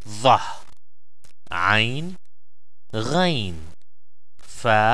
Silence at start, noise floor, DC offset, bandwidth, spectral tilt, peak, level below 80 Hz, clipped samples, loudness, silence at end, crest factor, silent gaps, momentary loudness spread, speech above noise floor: 0.05 s; under -90 dBFS; 4%; 11 kHz; -4.5 dB/octave; -2 dBFS; -52 dBFS; under 0.1%; -21 LUFS; 0 s; 20 dB; none; 19 LU; over 70 dB